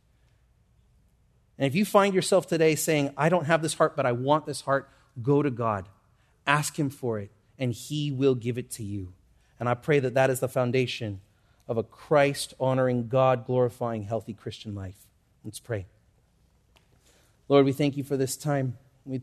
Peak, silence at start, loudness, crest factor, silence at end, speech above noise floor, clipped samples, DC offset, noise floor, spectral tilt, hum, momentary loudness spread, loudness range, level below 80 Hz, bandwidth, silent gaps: -4 dBFS; 1.6 s; -26 LUFS; 22 dB; 0 s; 39 dB; under 0.1%; under 0.1%; -64 dBFS; -5.5 dB/octave; none; 15 LU; 6 LU; -64 dBFS; 13.5 kHz; none